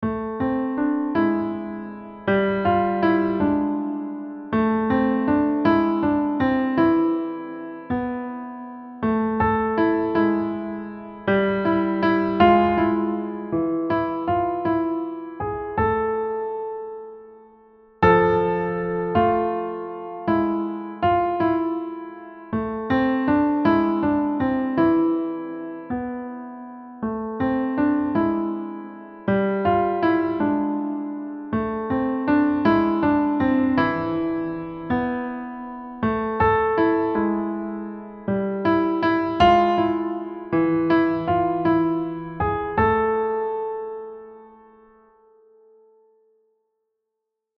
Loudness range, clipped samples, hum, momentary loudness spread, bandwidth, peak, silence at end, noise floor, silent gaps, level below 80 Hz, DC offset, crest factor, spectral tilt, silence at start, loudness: 4 LU; under 0.1%; none; 13 LU; 5.8 kHz; -4 dBFS; 3.1 s; -81 dBFS; none; -48 dBFS; under 0.1%; 18 dB; -9 dB/octave; 0 s; -22 LUFS